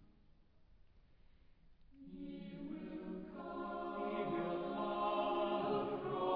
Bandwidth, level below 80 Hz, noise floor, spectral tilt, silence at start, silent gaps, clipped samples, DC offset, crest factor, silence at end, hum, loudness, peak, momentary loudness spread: 5.2 kHz; -66 dBFS; -66 dBFS; -4.5 dB/octave; 0 s; none; under 0.1%; under 0.1%; 16 dB; 0 s; none; -41 LUFS; -26 dBFS; 12 LU